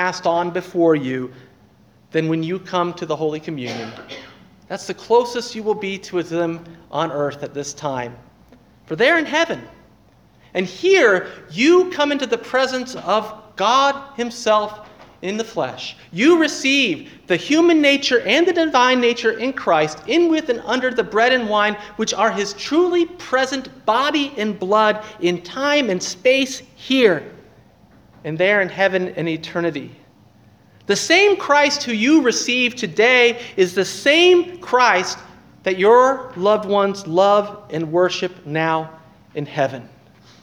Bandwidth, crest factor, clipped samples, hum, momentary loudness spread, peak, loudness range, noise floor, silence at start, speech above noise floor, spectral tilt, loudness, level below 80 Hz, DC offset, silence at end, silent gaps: 13.5 kHz; 18 dB; under 0.1%; none; 14 LU; 0 dBFS; 8 LU; -52 dBFS; 0 s; 34 dB; -4 dB/octave; -18 LUFS; -60 dBFS; under 0.1%; 0.55 s; none